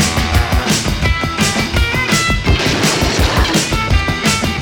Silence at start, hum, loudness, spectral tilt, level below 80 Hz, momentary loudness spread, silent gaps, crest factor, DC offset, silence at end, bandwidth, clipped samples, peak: 0 s; none; -14 LUFS; -4 dB/octave; -20 dBFS; 2 LU; none; 14 dB; under 0.1%; 0 s; 20 kHz; under 0.1%; 0 dBFS